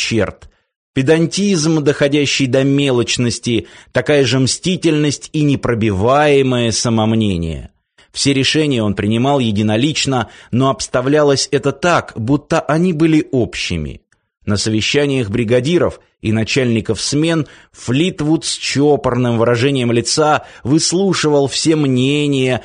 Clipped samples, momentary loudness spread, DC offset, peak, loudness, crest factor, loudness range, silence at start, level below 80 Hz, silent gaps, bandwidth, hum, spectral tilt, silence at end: under 0.1%; 7 LU; under 0.1%; -2 dBFS; -15 LUFS; 14 dB; 2 LU; 0 s; -42 dBFS; 0.76-0.93 s; 10 kHz; none; -5 dB/octave; 0 s